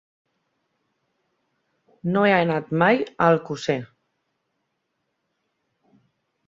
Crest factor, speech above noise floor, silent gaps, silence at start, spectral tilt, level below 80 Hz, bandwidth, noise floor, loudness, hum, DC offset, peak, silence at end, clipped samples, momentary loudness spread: 22 dB; 56 dB; none; 2.05 s; -6.5 dB/octave; -66 dBFS; 7.6 kHz; -76 dBFS; -21 LUFS; none; under 0.1%; -4 dBFS; 2.6 s; under 0.1%; 8 LU